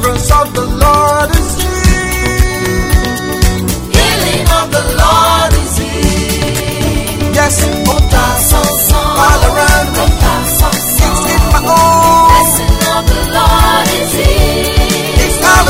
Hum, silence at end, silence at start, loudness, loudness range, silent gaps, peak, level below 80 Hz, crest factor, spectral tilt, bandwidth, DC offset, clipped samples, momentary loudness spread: none; 0 s; 0 s; -10 LUFS; 3 LU; none; 0 dBFS; -14 dBFS; 10 dB; -4 dB/octave; 16.5 kHz; under 0.1%; 0.4%; 6 LU